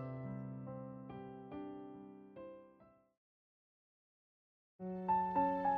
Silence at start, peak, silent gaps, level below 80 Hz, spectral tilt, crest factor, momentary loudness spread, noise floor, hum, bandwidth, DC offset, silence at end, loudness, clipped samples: 0 s; -24 dBFS; 3.17-4.79 s; -74 dBFS; -10 dB/octave; 20 dB; 20 LU; -67 dBFS; none; 4.7 kHz; under 0.1%; 0 s; -41 LUFS; under 0.1%